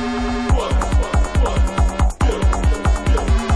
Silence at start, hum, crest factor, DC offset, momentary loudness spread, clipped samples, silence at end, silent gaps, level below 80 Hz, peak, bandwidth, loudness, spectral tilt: 0 s; none; 12 dB; under 0.1%; 1 LU; under 0.1%; 0 s; none; -18 dBFS; -4 dBFS; 11 kHz; -19 LUFS; -6 dB/octave